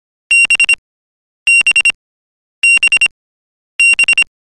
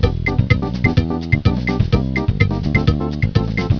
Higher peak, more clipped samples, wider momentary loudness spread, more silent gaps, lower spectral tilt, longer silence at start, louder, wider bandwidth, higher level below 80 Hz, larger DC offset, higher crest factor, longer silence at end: second, -4 dBFS vs 0 dBFS; neither; first, 7 LU vs 2 LU; first, 0.78-1.46 s, 1.95-2.62 s, 3.11-3.79 s vs none; second, 3.5 dB/octave vs -8 dB/octave; first, 0.3 s vs 0 s; first, -9 LUFS vs -18 LUFS; first, 14.5 kHz vs 5.4 kHz; second, -50 dBFS vs -26 dBFS; second, under 0.1% vs 0.4%; second, 8 dB vs 16 dB; first, 0.3 s vs 0 s